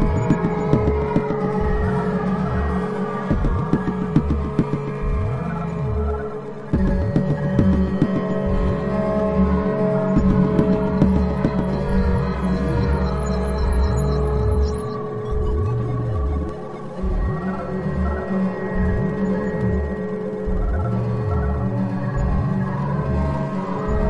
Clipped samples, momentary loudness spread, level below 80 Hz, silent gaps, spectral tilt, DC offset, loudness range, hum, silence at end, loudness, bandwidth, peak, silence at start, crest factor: under 0.1%; 7 LU; -26 dBFS; none; -9 dB/octave; 0.9%; 5 LU; none; 0 s; -22 LUFS; 11.5 kHz; -2 dBFS; 0 s; 18 dB